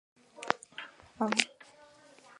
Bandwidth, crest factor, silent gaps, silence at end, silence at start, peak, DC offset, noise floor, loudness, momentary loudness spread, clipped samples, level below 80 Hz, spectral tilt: 11.5 kHz; 32 dB; none; 0.95 s; 0.35 s; -6 dBFS; under 0.1%; -58 dBFS; -32 LUFS; 18 LU; under 0.1%; -78 dBFS; -2 dB/octave